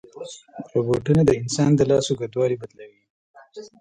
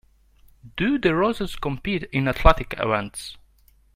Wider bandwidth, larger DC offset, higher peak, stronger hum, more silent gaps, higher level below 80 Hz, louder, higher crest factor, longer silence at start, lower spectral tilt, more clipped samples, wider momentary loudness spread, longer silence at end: second, 10.5 kHz vs 16 kHz; neither; second, -4 dBFS vs 0 dBFS; neither; first, 3.10-3.34 s vs none; second, -50 dBFS vs -30 dBFS; about the same, -21 LUFS vs -23 LUFS; second, 18 dB vs 24 dB; second, 0.15 s vs 0.65 s; about the same, -6.5 dB/octave vs -6 dB/octave; neither; first, 21 LU vs 15 LU; second, 0.15 s vs 0.6 s